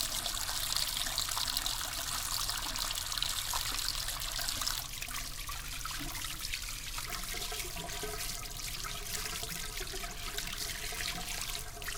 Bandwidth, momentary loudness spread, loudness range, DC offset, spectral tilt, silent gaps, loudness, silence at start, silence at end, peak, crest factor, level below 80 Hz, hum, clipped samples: 19 kHz; 7 LU; 5 LU; under 0.1%; -0.5 dB/octave; none; -35 LUFS; 0 s; 0 s; -12 dBFS; 26 dB; -46 dBFS; none; under 0.1%